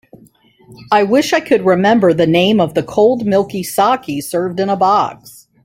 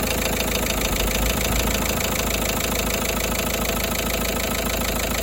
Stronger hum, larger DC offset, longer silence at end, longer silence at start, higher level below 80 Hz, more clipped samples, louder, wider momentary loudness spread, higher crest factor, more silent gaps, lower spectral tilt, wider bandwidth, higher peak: neither; neither; first, 0.35 s vs 0 s; first, 0.7 s vs 0 s; second, -54 dBFS vs -30 dBFS; neither; first, -14 LUFS vs -22 LUFS; first, 7 LU vs 2 LU; about the same, 14 dB vs 16 dB; neither; first, -5.5 dB/octave vs -3 dB/octave; about the same, 16.5 kHz vs 17 kHz; first, 0 dBFS vs -6 dBFS